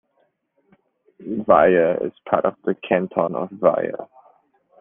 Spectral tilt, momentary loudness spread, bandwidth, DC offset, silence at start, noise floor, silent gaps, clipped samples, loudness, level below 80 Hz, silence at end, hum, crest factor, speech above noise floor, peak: -5.5 dB/octave; 13 LU; 3.7 kHz; under 0.1%; 1.2 s; -67 dBFS; none; under 0.1%; -20 LUFS; -60 dBFS; 0.75 s; none; 20 dB; 48 dB; -2 dBFS